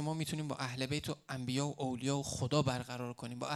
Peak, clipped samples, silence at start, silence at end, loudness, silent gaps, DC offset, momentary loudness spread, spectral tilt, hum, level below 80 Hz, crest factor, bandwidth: -16 dBFS; under 0.1%; 0 s; 0 s; -37 LUFS; none; under 0.1%; 9 LU; -5 dB/octave; none; -66 dBFS; 20 dB; 13.5 kHz